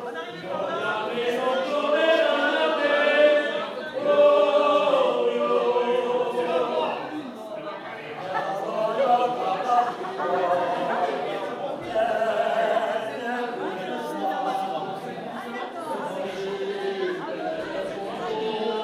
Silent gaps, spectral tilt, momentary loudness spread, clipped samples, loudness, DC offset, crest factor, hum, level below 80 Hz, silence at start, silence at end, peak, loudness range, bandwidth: none; -4.5 dB/octave; 13 LU; under 0.1%; -25 LUFS; under 0.1%; 18 dB; none; -70 dBFS; 0 s; 0 s; -6 dBFS; 9 LU; 13.5 kHz